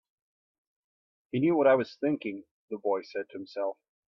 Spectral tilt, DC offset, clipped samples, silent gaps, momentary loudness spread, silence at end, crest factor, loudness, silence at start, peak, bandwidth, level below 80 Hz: -8.5 dB/octave; under 0.1%; under 0.1%; 2.51-2.68 s; 15 LU; 0.35 s; 20 dB; -29 LUFS; 1.35 s; -12 dBFS; 6.4 kHz; -76 dBFS